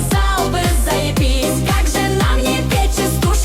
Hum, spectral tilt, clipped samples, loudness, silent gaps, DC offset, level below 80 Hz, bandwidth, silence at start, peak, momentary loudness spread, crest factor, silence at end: none; -4.5 dB/octave; under 0.1%; -16 LUFS; none; under 0.1%; -18 dBFS; 16.5 kHz; 0 s; -6 dBFS; 1 LU; 10 dB; 0 s